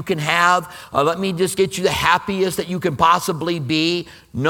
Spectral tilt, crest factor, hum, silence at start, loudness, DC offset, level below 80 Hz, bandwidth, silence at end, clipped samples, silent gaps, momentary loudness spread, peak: -4.5 dB/octave; 18 dB; none; 0 s; -18 LUFS; under 0.1%; -48 dBFS; 19 kHz; 0 s; under 0.1%; none; 7 LU; 0 dBFS